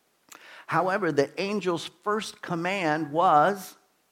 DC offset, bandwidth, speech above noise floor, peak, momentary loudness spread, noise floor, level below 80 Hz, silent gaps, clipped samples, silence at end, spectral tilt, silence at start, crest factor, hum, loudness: under 0.1%; 16.5 kHz; 27 dB; -8 dBFS; 11 LU; -52 dBFS; -78 dBFS; none; under 0.1%; 0.4 s; -5 dB/octave; 0.45 s; 20 dB; none; -26 LUFS